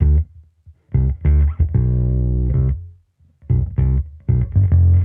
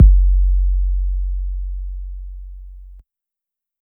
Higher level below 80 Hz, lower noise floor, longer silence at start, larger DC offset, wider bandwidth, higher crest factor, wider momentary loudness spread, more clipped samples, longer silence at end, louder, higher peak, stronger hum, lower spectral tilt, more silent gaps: about the same, -20 dBFS vs -18 dBFS; second, -53 dBFS vs -86 dBFS; about the same, 0 s vs 0 s; neither; first, 2.4 kHz vs 0.3 kHz; about the same, 12 dB vs 16 dB; second, 6 LU vs 21 LU; neither; second, 0 s vs 0.8 s; first, -18 LUFS vs -21 LUFS; second, -4 dBFS vs 0 dBFS; neither; about the same, -13.5 dB/octave vs -13.5 dB/octave; neither